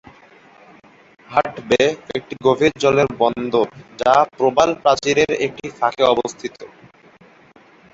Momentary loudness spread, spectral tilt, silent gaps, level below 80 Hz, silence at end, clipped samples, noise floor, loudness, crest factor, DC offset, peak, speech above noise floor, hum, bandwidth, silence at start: 10 LU; -4.5 dB/octave; none; -54 dBFS; 1.25 s; under 0.1%; -49 dBFS; -18 LUFS; 18 dB; under 0.1%; -2 dBFS; 31 dB; none; 8 kHz; 1.3 s